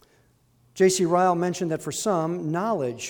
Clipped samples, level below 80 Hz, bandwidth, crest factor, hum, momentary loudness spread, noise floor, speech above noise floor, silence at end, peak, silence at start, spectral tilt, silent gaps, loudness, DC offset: under 0.1%; -66 dBFS; 19 kHz; 16 dB; none; 6 LU; -62 dBFS; 38 dB; 0 s; -8 dBFS; 0.75 s; -5 dB/octave; none; -24 LUFS; under 0.1%